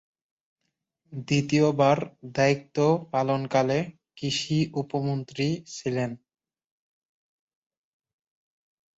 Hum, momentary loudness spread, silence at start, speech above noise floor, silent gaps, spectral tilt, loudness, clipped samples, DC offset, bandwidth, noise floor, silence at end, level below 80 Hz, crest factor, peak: none; 11 LU; 1.1 s; 55 dB; none; -6 dB/octave; -26 LUFS; under 0.1%; under 0.1%; 8 kHz; -80 dBFS; 2.85 s; -66 dBFS; 20 dB; -8 dBFS